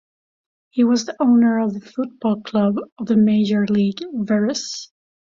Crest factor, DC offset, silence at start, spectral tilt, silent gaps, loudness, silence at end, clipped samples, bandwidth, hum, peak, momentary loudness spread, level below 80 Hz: 12 dB; under 0.1%; 0.75 s; -6 dB/octave; 2.92-2.96 s; -19 LUFS; 0.45 s; under 0.1%; 7.6 kHz; none; -6 dBFS; 11 LU; -62 dBFS